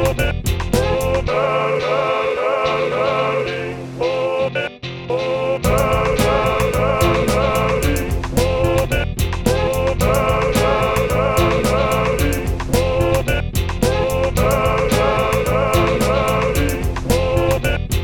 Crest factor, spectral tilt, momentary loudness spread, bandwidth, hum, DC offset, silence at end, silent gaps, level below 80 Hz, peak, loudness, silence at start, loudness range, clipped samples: 16 dB; -5.5 dB/octave; 5 LU; 19 kHz; none; under 0.1%; 0 s; none; -26 dBFS; 0 dBFS; -18 LUFS; 0 s; 2 LU; under 0.1%